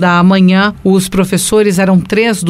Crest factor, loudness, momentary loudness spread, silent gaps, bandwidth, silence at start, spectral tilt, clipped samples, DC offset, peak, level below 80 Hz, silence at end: 10 dB; -10 LUFS; 4 LU; none; 15.5 kHz; 0 s; -5.5 dB/octave; under 0.1%; under 0.1%; 0 dBFS; -38 dBFS; 0 s